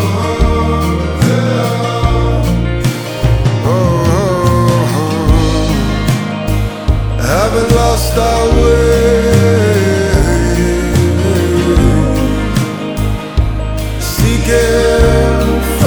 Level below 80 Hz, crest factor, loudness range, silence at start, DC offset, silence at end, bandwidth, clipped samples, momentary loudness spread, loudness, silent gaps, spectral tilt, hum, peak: -18 dBFS; 10 dB; 3 LU; 0 s; 0.4%; 0 s; over 20 kHz; under 0.1%; 6 LU; -12 LUFS; none; -6 dB/octave; none; 0 dBFS